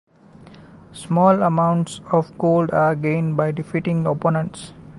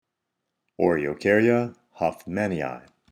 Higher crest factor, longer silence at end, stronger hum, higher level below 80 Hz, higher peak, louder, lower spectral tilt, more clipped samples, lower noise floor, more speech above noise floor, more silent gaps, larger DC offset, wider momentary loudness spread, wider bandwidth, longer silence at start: about the same, 16 dB vs 20 dB; second, 0 s vs 0.3 s; neither; about the same, -56 dBFS vs -60 dBFS; about the same, -4 dBFS vs -6 dBFS; first, -19 LUFS vs -24 LUFS; about the same, -8 dB/octave vs -7.5 dB/octave; neither; second, -45 dBFS vs -81 dBFS; second, 26 dB vs 58 dB; neither; neither; second, 8 LU vs 13 LU; second, 11.5 kHz vs 14 kHz; second, 0.6 s vs 0.8 s